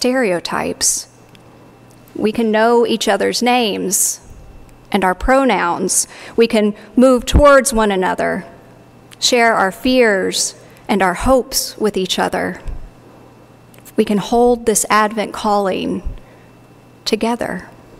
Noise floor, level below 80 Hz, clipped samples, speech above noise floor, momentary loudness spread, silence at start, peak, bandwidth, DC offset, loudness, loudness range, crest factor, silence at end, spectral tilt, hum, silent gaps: -44 dBFS; -32 dBFS; under 0.1%; 29 dB; 11 LU; 0 s; -2 dBFS; 16 kHz; under 0.1%; -15 LUFS; 5 LU; 16 dB; 0.3 s; -3.5 dB/octave; none; none